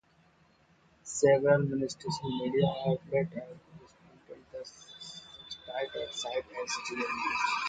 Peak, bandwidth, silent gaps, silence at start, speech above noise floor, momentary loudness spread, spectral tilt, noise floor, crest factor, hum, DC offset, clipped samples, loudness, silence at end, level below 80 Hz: -12 dBFS; 9.4 kHz; none; 1.05 s; 35 dB; 21 LU; -5 dB/octave; -65 dBFS; 20 dB; none; under 0.1%; under 0.1%; -31 LUFS; 0 s; -66 dBFS